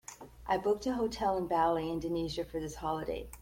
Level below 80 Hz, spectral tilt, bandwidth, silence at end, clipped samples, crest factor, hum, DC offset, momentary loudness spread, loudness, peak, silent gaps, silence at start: -52 dBFS; -5.5 dB/octave; 16.5 kHz; 0 s; under 0.1%; 16 dB; none; under 0.1%; 9 LU; -34 LUFS; -18 dBFS; none; 0.1 s